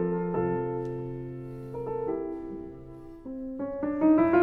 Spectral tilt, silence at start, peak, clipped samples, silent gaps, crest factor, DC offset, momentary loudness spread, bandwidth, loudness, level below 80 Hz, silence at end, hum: -10.5 dB/octave; 0 s; -12 dBFS; under 0.1%; none; 18 dB; under 0.1%; 18 LU; 4 kHz; -30 LUFS; -52 dBFS; 0 s; none